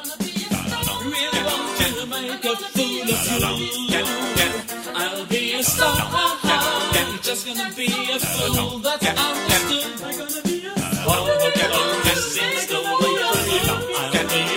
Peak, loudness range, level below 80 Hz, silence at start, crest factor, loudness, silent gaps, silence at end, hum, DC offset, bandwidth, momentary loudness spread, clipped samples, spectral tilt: -2 dBFS; 2 LU; -44 dBFS; 0 s; 20 dB; -20 LUFS; none; 0 s; none; under 0.1%; 16.5 kHz; 7 LU; under 0.1%; -2.5 dB/octave